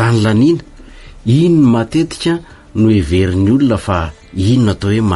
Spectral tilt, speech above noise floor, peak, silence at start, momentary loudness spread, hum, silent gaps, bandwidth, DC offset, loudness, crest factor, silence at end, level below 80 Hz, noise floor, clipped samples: -7.5 dB/octave; 23 dB; -2 dBFS; 0 s; 9 LU; none; none; 11.5 kHz; under 0.1%; -13 LUFS; 10 dB; 0 s; -34 dBFS; -35 dBFS; under 0.1%